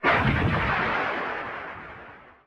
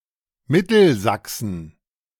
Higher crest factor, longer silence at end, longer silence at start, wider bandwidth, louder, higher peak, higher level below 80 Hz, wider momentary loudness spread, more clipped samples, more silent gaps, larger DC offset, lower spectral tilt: about the same, 18 dB vs 18 dB; second, 0.15 s vs 0.5 s; second, 0 s vs 0.5 s; second, 8.8 kHz vs 18 kHz; second, -25 LUFS vs -19 LUFS; second, -8 dBFS vs -4 dBFS; first, -40 dBFS vs -54 dBFS; first, 20 LU vs 14 LU; neither; neither; neither; first, -7 dB/octave vs -5.5 dB/octave